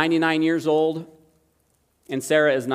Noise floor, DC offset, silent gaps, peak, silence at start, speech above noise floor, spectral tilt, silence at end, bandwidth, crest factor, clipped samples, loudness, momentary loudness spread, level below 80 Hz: -66 dBFS; under 0.1%; none; -4 dBFS; 0 s; 46 dB; -5 dB/octave; 0 s; 15.5 kHz; 18 dB; under 0.1%; -21 LUFS; 12 LU; -72 dBFS